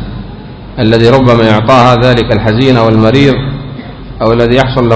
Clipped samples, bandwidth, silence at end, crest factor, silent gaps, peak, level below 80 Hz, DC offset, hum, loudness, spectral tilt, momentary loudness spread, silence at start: 5%; 8 kHz; 0 s; 8 dB; none; 0 dBFS; -26 dBFS; under 0.1%; none; -7 LUFS; -7.5 dB/octave; 19 LU; 0 s